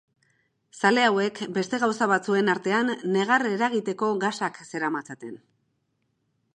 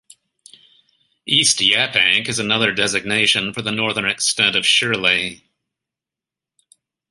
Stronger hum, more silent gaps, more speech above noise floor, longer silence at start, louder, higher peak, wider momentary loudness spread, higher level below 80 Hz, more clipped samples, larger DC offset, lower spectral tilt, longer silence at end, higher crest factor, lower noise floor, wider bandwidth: neither; neither; second, 49 dB vs 69 dB; second, 0.75 s vs 1.25 s; second, -24 LUFS vs -16 LUFS; about the same, -4 dBFS vs -2 dBFS; first, 10 LU vs 6 LU; second, -78 dBFS vs -58 dBFS; neither; neither; first, -4.5 dB/octave vs -1.5 dB/octave; second, 1.2 s vs 1.75 s; about the same, 20 dB vs 20 dB; second, -74 dBFS vs -88 dBFS; about the same, 11 kHz vs 11.5 kHz